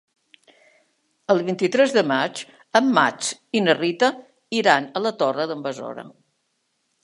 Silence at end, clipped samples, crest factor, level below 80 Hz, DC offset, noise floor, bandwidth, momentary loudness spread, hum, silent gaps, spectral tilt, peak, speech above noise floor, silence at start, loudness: 0.95 s; under 0.1%; 22 dB; -78 dBFS; under 0.1%; -72 dBFS; 11.5 kHz; 15 LU; none; none; -4 dB/octave; 0 dBFS; 51 dB; 1.3 s; -21 LUFS